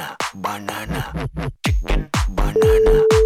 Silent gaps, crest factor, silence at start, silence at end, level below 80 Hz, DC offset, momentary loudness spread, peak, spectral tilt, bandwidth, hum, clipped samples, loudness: none; 12 dB; 0 s; 0 s; -24 dBFS; under 0.1%; 13 LU; -4 dBFS; -5.5 dB/octave; 15.5 kHz; none; under 0.1%; -20 LUFS